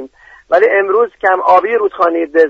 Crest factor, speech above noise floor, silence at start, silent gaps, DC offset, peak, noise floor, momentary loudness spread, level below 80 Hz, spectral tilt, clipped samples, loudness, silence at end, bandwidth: 12 dB; 24 dB; 0 s; none; under 0.1%; 0 dBFS; -35 dBFS; 4 LU; -56 dBFS; -5.5 dB/octave; under 0.1%; -12 LUFS; 0 s; 6.6 kHz